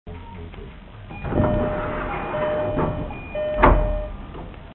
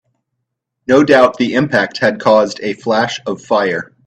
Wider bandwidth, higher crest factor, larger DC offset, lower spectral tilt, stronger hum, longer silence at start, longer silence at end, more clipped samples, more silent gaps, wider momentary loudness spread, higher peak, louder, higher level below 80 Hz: second, 4.2 kHz vs 9.2 kHz; first, 22 dB vs 14 dB; neither; first, -12 dB/octave vs -5.5 dB/octave; neither; second, 0.05 s vs 0.9 s; second, 0 s vs 0.2 s; neither; neither; first, 21 LU vs 9 LU; about the same, 0 dBFS vs 0 dBFS; second, -23 LUFS vs -13 LUFS; first, -30 dBFS vs -56 dBFS